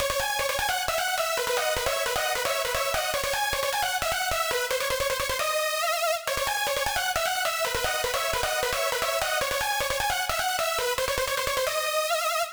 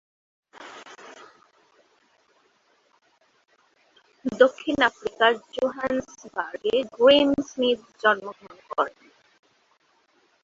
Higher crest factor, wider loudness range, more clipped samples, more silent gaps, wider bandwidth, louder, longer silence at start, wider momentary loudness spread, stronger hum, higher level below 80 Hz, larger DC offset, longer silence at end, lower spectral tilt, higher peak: second, 18 dB vs 24 dB; second, 0 LU vs 6 LU; neither; neither; first, over 20 kHz vs 7.6 kHz; second, -26 LUFS vs -23 LUFS; second, 0 s vs 0.6 s; second, 1 LU vs 24 LU; neither; first, -46 dBFS vs -64 dBFS; neither; second, 0 s vs 1.55 s; second, -0.5 dB/octave vs -4 dB/octave; second, -10 dBFS vs -2 dBFS